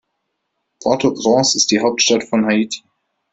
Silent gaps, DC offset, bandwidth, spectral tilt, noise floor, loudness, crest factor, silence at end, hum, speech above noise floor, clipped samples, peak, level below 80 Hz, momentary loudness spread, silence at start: none; under 0.1%; 8.4 kHz; -3 dB/octave; -73 dBFS; -15 LUFS; 18 dB; 0.55 s; none; 58 dB; under 0.1%; 0 dBFS; -58 dBFS; 10 LU; 0.8 s